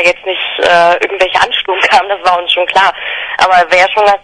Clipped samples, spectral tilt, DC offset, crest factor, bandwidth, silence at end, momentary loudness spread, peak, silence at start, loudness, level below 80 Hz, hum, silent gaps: 0.7%; -2 dB/octave; under 0.1%; 10 dB; 12 kHz; 0.05 s; 5 LU; 0 dBFS; 0 s; -10 LUFS; -46 dBFS; none; none